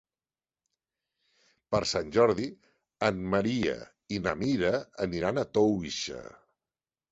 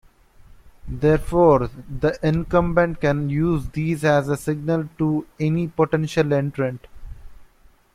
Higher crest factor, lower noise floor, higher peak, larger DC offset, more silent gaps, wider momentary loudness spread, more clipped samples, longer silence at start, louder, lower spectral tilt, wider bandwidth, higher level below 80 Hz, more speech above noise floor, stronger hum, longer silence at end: about the same, 22 dB vs 18 dB; first, under -90 dBFS vs -53 dBFS; second, -10 dBFS vs -4 dBFS; neither; neither; first, 11 LU vs 8 LU; neither; first, 1.7 s vs 0.5 s; second, -29 LUFS vs -21 LUFS; second, -5 dB/octave vs -7.5 dB/octave; second, 8.2 kHz vs 14 kHz; second, -56 dBFS vs -38 dBFS; first, over 61 dB vs 33 dB; neither; first, 0.85 s vs 0.5 s